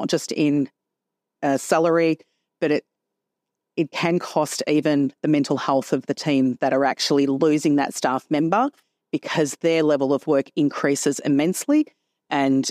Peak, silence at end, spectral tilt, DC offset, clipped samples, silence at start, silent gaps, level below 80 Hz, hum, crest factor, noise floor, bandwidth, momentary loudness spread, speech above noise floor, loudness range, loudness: -6 dBFS; 0 s; -5 dB/octave; under 0.1%; under 0.1%; 0 s; none; -72 dBFS; none; 16 dB; -83 dBFS; 15.5 kHz; 7 LU; 62 dB; 3 LU; -22 LUFS